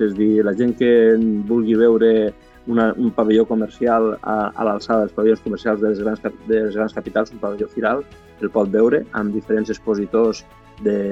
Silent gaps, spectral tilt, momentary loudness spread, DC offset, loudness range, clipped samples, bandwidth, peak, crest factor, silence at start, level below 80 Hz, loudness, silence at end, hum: none; -7.5 dB/octave; 9 LU; under 0.1%; 4 LU; under 0.1%; 7.6 kHz; -4 dBFS; 14 dB; 0 s; -50 dBFS; -18 LUFS; 0 s; none